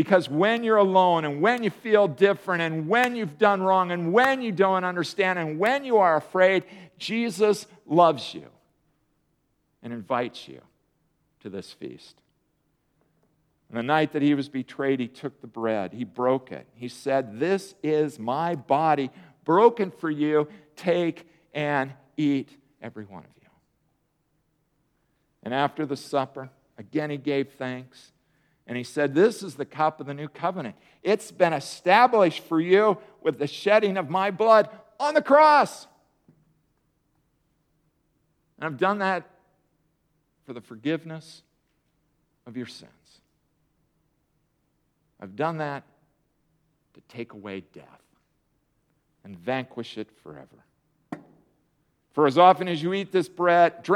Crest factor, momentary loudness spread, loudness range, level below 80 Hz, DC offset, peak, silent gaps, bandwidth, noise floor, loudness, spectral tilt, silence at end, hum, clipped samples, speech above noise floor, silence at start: 22 dB; 20 LU; 16 LU; -76 dBFS; under 0.1%; -4 dBFS; none; 14.5 kHz; -72 dBFS; -24 LUFS; -6 dB/octave; 0 s; none; under 0.1%; 48 dB; 0 s